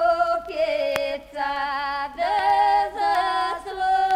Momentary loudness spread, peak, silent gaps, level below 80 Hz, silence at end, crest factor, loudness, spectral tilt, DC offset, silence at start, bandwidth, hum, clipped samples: 8 LU; -4 dBFS; none; -52 dBFS; 0 s; 18 dB; -23 LUFS; -3 dB/octave; under 0.1%; 0 s; 16 kHz; none; under 0.1%